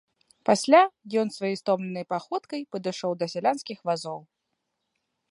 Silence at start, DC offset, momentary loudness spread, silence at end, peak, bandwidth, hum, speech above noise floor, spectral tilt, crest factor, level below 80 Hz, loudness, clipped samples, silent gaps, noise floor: 0.45 s; under 0.1%; 13 LU; 1.1 s; -4 dBFS; 11.5 kHz; none; 55 dB; -4.5 dB/octave; 22 dB; -78 dBFS; -26 LUFS; under 0.1%; none; -80 dBFS